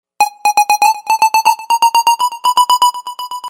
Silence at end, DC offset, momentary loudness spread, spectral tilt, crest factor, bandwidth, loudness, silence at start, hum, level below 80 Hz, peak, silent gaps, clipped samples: 0 s; under 0.1%; 4 LU; 2.5 dB/octave; 12 dB; 16.5 kHz; -12 LUFS; 0.2 s; none; -74 dBFS; 0 dBFS; none; under 0.1%